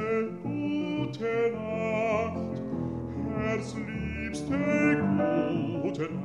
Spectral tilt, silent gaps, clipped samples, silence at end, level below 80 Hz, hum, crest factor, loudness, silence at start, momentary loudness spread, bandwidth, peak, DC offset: -7 dB/octave; none; under 0.1%; 0 s; -52 dBFS; none; 16 dB; -30 LUFS; 0 s; 9 LU; 10.5 kHz; -14 dBFS; under 0.1%